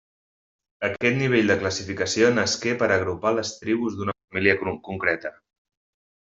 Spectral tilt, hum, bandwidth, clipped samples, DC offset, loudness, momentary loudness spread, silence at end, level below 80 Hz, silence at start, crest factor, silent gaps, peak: -4.5 dB/octave; none; 8 kHz; under 0.1%; under 0.1%; -23 LUFS; 9 LU; 0.95 s; -62 dBFS; 0.8 s; 22 dB; 4.24-4.28 s; -4 dBFS